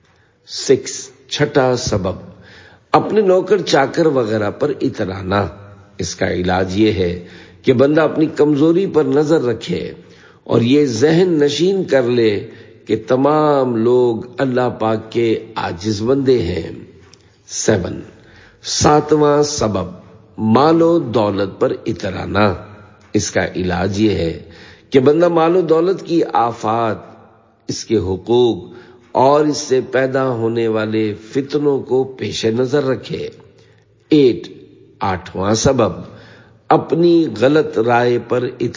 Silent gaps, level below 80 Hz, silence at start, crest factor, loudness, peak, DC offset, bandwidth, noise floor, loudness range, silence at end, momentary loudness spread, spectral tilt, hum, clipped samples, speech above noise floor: none; -42 dBFS; 0.5 s; 16 dB; -16 LUFS; 0 dBFS; under 0.1%; 7.6 kHz; -50 dBFS; 4 LU; 0.05 s; 12 LU; -5.5 dB/octave; none; under 0.1%; 35 dB